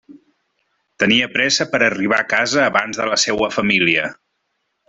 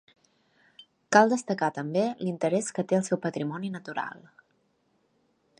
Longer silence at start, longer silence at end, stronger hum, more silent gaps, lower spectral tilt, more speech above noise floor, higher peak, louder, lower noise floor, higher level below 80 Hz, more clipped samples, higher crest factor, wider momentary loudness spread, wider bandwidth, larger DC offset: second, 0.1 s vs 1.1 s; second, 0.75 s vs 1.4 s; neither; neither; second, -2.5 dB/octave vs -5 dB/octave; first, 54 dB vs 44 dB; first, 0 dBFS vs -4 dBFS; first, -16 LUFS vs -27 LUFS; about the same, -71 dBFS vs -71 dBFS; first, -56 dBFS vs -78 dBFS; neither; second, 18 dB vs 24 dB; second, 5 LU vs 13 LU; second, 8.4 kHz vs 11 kHz; neither